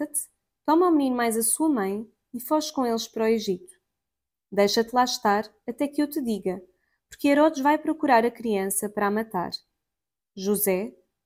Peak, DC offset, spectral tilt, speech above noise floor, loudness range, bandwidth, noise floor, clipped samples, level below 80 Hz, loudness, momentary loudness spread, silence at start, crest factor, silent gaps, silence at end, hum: -8 dBFS; under 0.1%; -3.5 dB/octave; 65 dB; 2 LU; 17 kHz; -89 dBFS; under 0.1%; -66 dBFS; -24 LUFS; 13 LU; 0 s; 16 dB; none; 0.35 s; none